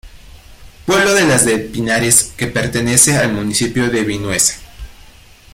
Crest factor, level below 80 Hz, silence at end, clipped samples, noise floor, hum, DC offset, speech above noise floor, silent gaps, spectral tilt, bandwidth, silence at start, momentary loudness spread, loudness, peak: 16 dB; -38 dBFS; 0.6 s; under 0.1%; -41 dBFS; none; under 0.1%; 27 dB; none; -3 dB/octave; 17 kHz; 0.05 s; 8 LU; -13 LUFS; 0 dBFS